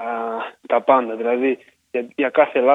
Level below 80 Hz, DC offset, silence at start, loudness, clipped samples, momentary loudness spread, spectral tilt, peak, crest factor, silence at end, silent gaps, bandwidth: -76 dBFS; under 0.1%; 0 s; -20 LUFS; under 0.1%; 12 LU; -6.5 dB/octave; -2 dBFS; 18 dB; 0 s; none; 4 kHz